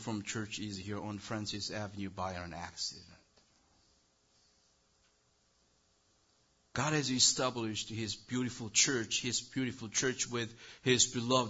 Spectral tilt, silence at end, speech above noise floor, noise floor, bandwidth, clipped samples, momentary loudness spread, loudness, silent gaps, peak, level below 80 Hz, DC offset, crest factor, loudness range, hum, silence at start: -2.5 dB/octave; 0 s; 38 dB; -73 dBFS; 8 kHz; under 0.1%; 13 LU; -34 LUFS; none; -14 dBFS; -66 dBFS; under 0.1%; 24 dB; 14 LU; none; 0 s